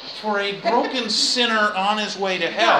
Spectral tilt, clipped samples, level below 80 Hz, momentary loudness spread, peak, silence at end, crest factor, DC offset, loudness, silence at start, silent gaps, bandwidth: -2 dB/octave; under 0.1%; -70 dBFS; 6 LU; -4 dBFS; 0 s; 18 dB; under 0.1%; -20 LUFS; 0 s; none; 14 kHz